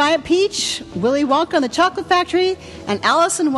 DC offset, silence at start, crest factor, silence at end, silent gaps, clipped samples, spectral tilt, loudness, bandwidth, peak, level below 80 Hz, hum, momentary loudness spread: under 0.1%; 0 s; 14 dB; 0 s; none; under 0.1%; -3 dB/octave; -17 LUFS; 12.5 kHz; -4 dBFS; -48 dBFS; none; 6 LU